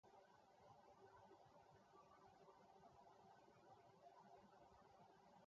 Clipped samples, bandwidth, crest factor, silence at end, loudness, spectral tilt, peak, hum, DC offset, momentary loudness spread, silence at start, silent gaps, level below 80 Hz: under 0.1%; 7.2 kHz; 14 dB; 0 s; -69 LUFS; -4.5 dB/octave; -56 dBFS; none; under 0.1%; 1 LU; 0.05 s; none; under -90 dBFS